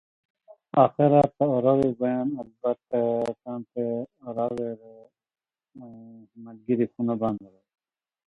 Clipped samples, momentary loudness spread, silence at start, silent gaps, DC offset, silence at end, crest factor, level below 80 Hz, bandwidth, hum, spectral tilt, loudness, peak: under 0.1%; 22 LU; 0.75 s; none; under 0.1%; 0.8 s; 22 dB; -62 dBFS; 8.6 kHz; none; -9.5 dB/octave; -25 LUFS; -6 dBFS